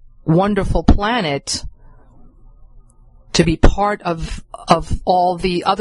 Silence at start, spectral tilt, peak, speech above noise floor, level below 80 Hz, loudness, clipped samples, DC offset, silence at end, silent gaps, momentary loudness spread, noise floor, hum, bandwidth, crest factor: 0.25 s; -5.5 dB/octave; 0 dBFS; 30 dB; -24 dBFS; -17 LUFS; under 0.1%; under 0.1%; 0 s; none; 8 LU; -46 dBFS; none; 11.5 kHz; 18 dB